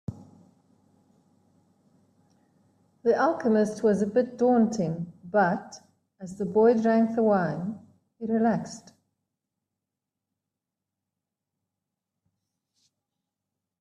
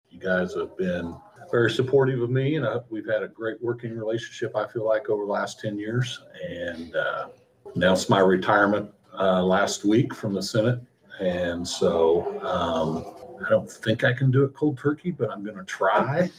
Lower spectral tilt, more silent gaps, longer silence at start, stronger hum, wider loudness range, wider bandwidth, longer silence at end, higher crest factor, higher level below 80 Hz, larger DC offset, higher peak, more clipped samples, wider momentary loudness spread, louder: first, -7.5 dB/octave vs -6 dB/octave; neither; about the same, 0.1 s vs 0.15 s; neither; about the same, 8 LU vs 6 LU; second, 10.5 kHz vs 15 kHz; first, 5 s vs 0.1 s; about the same, 18 dB vs 20 dB; second, -70 dBFS vs -62 dBFS; neither; second, -10 dBFS vs -4 dBFS; neither; first, 19 LU vs 12 LU; about the same, -25 LUFS vs -25 LUFS